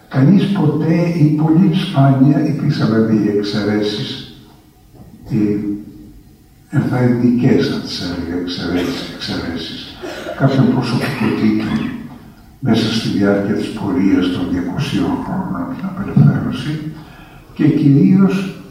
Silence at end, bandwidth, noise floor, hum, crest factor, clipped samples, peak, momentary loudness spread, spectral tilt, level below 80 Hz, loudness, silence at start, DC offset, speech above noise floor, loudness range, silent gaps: 0 s; 14 kHz; -45 dBFS; none; 16 dB; under 0.1%; 0 dBFS; 13 LU; -7.5 dB/octave; -44 dBFS; -16 LUFS; 0.1 s; under 0.1%; 30 dB; 6 LU; none